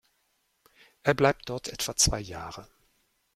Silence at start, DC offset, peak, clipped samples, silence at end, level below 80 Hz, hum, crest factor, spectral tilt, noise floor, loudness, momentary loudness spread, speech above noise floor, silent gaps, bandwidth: 1.05 s; under 0.1%; -8 dBFS; under 0.1%; 0.7 s; -46 dBFS; none; 24 dB; -3 dB/octave; -73 dBFS; -27 LUFS; 16 LU; 45 dB; none; 16 kHz